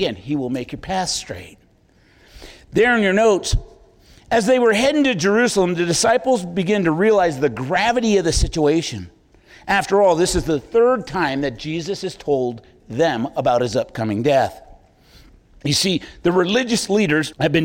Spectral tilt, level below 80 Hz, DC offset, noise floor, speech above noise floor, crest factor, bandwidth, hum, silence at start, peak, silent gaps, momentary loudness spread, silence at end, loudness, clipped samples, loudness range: -4.5 dB/octave; -36 dBFS; under 0.1%; -55 dBFS; 37 dB; 14 dB; 17 kHz; none; 0 s; -6 dBFS; none; 10 LU; 0 s; -18 LUFS; under 0.1%; 4 LU